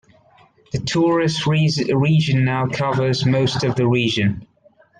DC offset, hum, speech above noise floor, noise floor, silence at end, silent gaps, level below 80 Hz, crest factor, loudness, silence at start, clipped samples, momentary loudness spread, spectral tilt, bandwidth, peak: under 0.1%; none; 36 dB; -54 dBFS; 0.55 s; none; -52 dBFS; 12 dB; -18 LUFS; 0.75 s; under 0.1%; 6 LU; -6 dB/octave; 9.4 kHz; -6 dBFS